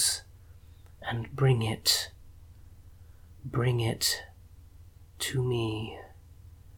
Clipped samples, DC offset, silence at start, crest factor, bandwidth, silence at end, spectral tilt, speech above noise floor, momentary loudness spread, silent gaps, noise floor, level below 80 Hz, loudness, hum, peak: under 0.1%; under 0.1%; 0 s; 22 dB; 19 kHz; 0 s; -4 dB/octave; 24 dB; 15 LU; none; -52 dBFS; -54 dBFS; -29 LUFS; none; -10 dBFS